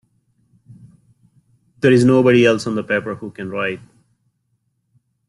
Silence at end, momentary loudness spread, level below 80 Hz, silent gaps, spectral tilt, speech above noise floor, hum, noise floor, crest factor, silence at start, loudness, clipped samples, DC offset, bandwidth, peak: 1.5 s; 16 LU; -58 dBFS; none; -6.5 dB/octave; 53 dB; none; -68 dBFS; 18 dB; 1.85 s; -16 LUFS; under 0.1%; under 0.1%; 11.5 kHz; -2 dBFS